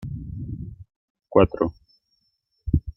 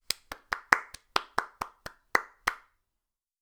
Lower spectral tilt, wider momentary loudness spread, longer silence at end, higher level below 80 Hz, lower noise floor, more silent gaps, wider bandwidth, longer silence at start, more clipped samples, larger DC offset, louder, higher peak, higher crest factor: first, -10.5 dB/octave vs -1 dB/octave; first, 18 LU vs 14 LU; second, 0.05 s vs 0.85 s; first, -38 dBFS vs -62 dBFS; second, -72 dBFS vs -87 dBFS; first, 0.96-1.15 s vs none; second, 5.8 kHz vs over 20 kHz; about the same, 0 s vs 0.1 s; neither; neither; first, -24 LUFS vs -31 LUFS; about the same, -2 dBFS vs 0 dBFS; second, 24 dB vs 34 dB